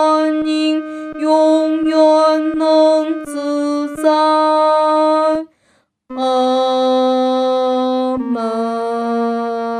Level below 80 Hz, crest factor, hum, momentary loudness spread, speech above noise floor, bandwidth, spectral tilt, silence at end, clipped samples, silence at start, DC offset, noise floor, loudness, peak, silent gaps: -60 dBFS; 12 dB; none; 8 LU; 46 dB; 12 kHz; -4 dB/octave; 0 s; under 0.1%; 0 s; under 0.1%; -59 dBFS; -15 LUFS; -2 dBFS; none